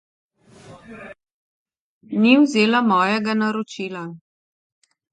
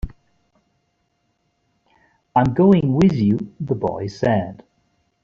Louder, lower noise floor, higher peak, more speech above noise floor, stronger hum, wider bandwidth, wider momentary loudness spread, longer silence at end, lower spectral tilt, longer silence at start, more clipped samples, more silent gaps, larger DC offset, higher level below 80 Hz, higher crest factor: about the same, -18 LUFS vs -18 LUFS; second, -46 dBFS vs -69 dBFS; about the same, -2 dBFS vs -4 dBFS; second, 28 dB vs 51 dB; neither; first, 9.2 kHz vs 7.2 kHz; first, 23 LU vs 11 LU; first, 0.95 s vs 0.7 s; second, -5.5 dB/octave vs -9 dB/octave; first, 0.7 s vs 0.05 s; neither; first, 1.32-1.66 s, 1.80-2.01 s vs none; neither; second, -68 dBFS vs -42 dBFS; about the same, 20 dB vs 18 dB